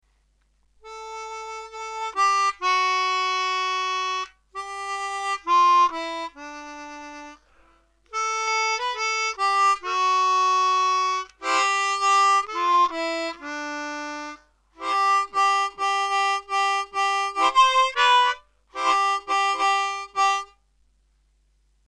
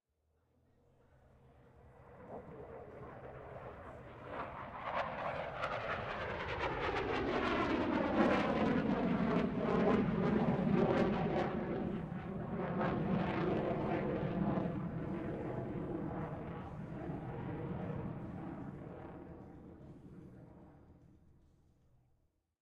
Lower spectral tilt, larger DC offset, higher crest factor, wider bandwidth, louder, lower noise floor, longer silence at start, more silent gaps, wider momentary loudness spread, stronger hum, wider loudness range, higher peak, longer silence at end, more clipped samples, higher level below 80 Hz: second, 0.5 dB/octave vs -8 dB/octave; neither; about the same, 18 dB vs 20 dB; first, 11 kHz vs 8.4 kHz; first, -22 LUFS vs -37 LUFS; second, -65 dBFS vs -79 dBFS; second, 0.85 s vs 1.75 s; neither; about the same, 17 LU vs 19 LU; neither; second, 4 LU vs 19 LU; first, -6 dBFS vs -18 dBFS; second, 1.45 s vs 1.65 s; neither; second, -62 dBFS vs -56 dBFS